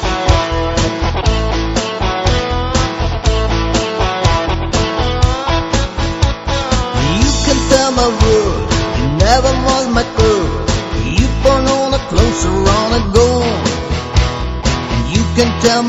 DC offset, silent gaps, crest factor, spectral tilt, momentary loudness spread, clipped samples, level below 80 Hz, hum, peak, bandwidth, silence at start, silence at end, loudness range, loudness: under 0.1%; none; 14 dB; -5 dB/octave; 6 LU; under 0.1%; -20 dBFS; none; 0 dBFS; 8.4 kHz; 0 s; 0 s; 3 LU; -14 LUFS